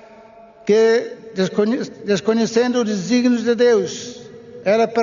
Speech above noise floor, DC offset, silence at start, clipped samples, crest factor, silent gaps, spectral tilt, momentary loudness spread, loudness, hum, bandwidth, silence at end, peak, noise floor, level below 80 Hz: 27 dB; under 0.1%; 0.65 s; under 0.1%; 14 dB; none; -4.5 dB/octave; 14 LU; -18 LUFS; none; 7.4 kHz; 0 s; -4 dBFS; -44 dBFS; -64 dBFS